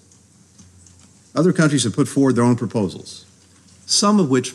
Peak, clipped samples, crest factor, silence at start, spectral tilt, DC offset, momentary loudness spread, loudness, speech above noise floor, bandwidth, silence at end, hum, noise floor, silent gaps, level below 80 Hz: -4 dBFS; under 0.1%; 14 dB; 1.35 s; -5 dB/octave; under 0.1%; 14 LU; -18 LUFS; 34 dB; 12.5 kHz; 0 s; none; -51 dBFS; none; -64 dBFS